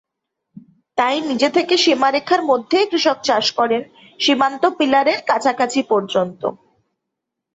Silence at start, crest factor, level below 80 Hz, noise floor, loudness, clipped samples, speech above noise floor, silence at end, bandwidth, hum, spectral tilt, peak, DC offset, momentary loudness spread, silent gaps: 0.55 s; 16 dB; -66 dBFS; -80 dBFS; -17 LUFS; under 0.1%; 63 dB; 1 s; 8.2 kHz; none; -3 dB/octave; -2 dBFS; under 0.1%; 6 LU; none